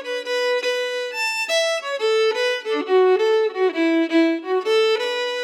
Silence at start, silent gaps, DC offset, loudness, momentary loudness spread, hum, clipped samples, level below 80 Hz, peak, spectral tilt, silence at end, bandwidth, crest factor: 0 s; none; under 0.1%; -20 LUFS; 5 LU; none; under 0.1%; under -90 dBFS; -8 dBFS; -0.5 dB/octave; 0 s; 17 kHz; 12 dB